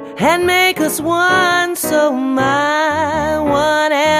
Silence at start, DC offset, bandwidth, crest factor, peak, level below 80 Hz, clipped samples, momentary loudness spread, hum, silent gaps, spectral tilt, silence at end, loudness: 0 s; under 0.1%; 15.5 kHz; 14 dB; 0 dBFS; -44 dBFS; under 0.1%; 4 LU; none; none; -3.5 dB/octave; 0 s; -14 LUFS